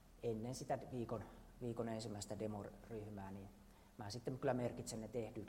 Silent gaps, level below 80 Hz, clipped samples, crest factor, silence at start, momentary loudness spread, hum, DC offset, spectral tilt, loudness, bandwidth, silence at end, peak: none; -66 dBFS; under 0.1%; 20 dB; 0 s; 13 LU; none; under 0.1%; -6 dB/octave; -47 LUFS; 16 kHz; 0 s; -26 dBFS